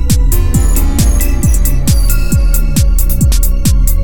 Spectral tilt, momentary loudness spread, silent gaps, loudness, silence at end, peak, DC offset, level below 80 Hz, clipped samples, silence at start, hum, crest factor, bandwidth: -5 dB/octave; 1 LU; none; -12 LUFS; 0 s; 0 dBFS; 10%; -10 dBFS; under 0.1%; 0 s; none; 10 dB; 20 kHz